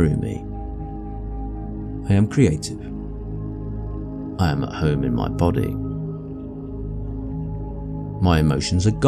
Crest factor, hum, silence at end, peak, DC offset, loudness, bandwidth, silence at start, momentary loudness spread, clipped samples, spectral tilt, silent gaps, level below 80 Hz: 18 dB; none; 0 s; -4 dBFS; under 0.1%; -24 LUFS; 13.5 kHz; 0 s; 13 LU; under 0.1%; -7 dB/octave; none; -32 dBFS